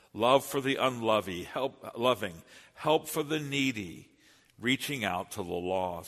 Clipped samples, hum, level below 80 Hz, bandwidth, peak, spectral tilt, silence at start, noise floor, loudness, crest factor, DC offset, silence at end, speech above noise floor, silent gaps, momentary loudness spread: under 0.1%; none; -66 dBFS; 13.5 kHz; -8 dBFS; -4 dB/octave; 0.15 s; -61 dBFS; -31 LUFS; 22 dB; under 0.1%; 0 s; 30 dB; none; 10 LU